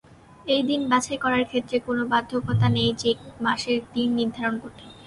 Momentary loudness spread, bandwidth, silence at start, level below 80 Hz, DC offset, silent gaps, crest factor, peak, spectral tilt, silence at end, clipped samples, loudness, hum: 5 LU; 11.5 kHz; 0.45 s; -52 dBFS; under 0.1%; none; 20 dB; -6 dBFS; -5.5 dB/octave; 0 s; under 0.1%; -24 LUFS; none